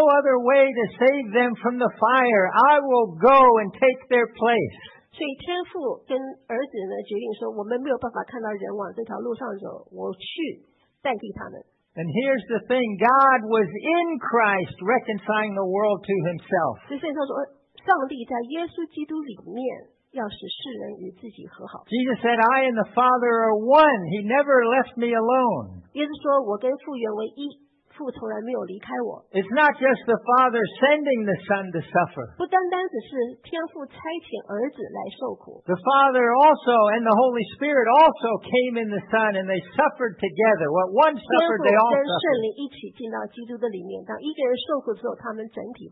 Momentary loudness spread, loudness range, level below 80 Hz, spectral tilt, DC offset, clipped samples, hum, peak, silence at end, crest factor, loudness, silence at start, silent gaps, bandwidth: 16 LU; 11 LU; -66 dBFS; -9.5 dB/octave; under 0.1%; under 0.1%; none; -6 dBFS; 0.05 s; 16 dB; -22 LUFS; 0 s; none; 5.6 kHz